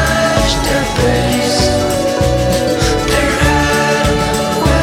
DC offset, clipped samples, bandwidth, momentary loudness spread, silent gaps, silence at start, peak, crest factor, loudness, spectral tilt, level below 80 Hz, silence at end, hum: under 0.1%; under 0.1%; 17.5 kHz; 2 LU; none; 0 s; 0 dBFS; 12 dB; -13 LUFS; -4.5 dB/octave; -22 dBFS; 0 s; none